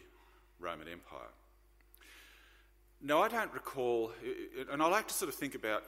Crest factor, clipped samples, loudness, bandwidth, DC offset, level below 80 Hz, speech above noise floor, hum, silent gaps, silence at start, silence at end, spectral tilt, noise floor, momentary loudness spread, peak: 22 dB; under 0.1%; -36 LUFS; 16 kHz; under 0.1%; -66 dBFS; 29 dB; 50 Hz at -65 dBFS; none; 0 s; 0 s; -3 dB/octave; -65 dBFS; 24 LU; -16 dBFS